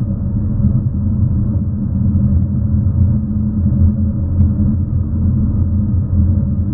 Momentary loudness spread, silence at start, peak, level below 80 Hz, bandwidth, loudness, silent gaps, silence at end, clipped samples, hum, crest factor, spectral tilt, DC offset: 4 LU; 0 s; -2 dBFS; -22 dBFS; 1.6 kHz; -16 LUFS; none; 0 s; under 0.1%; none; 12 dB; -16.5 dB/octave; under 0.1%